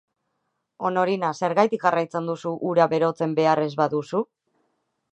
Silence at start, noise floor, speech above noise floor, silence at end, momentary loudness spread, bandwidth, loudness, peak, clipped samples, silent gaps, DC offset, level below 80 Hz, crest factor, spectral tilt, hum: 0.8 s; -76 dBFS; 54 dB; 0.9 s; 8 LU; 8.6 kHz; -23 LUFS; -4 dBFS; under 0.1%; none; under 0.1%; -74 dBFS; 20 dB; -6.5 dB/octave; none